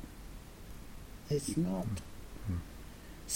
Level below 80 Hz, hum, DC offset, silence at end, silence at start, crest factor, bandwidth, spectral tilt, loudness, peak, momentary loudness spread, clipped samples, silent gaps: -50 dBFS; none; under 0.1%; 0 s; 0 s; 18 dB; 16.5 kHz; -5.5 dB/octave; -38 LUFS; -22 dBFS; 17 LU; under 0.1%; none